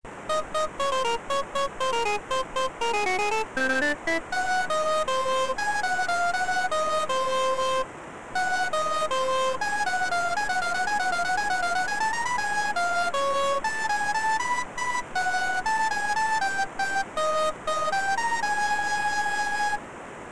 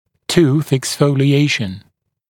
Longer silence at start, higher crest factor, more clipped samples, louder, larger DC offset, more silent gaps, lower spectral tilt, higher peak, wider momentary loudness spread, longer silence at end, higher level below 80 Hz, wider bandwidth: second, 0 s vs 0.3 s; about the same, 12 dB vs 16 dB; neither; second, -26 LUFS vs -15 LUFS; first, 2% vs under 0.1%; neither; second, -1.5 dB/octave vs -5.5 dB/octave; second, -16 dBFS vs 0 dBFS; second, 3 LU vs 8 LU; second, 0 s vs 0.5 s; about the same, -52 dBFS vs -50 dBFS; second, 11 kHz vs 17 kHz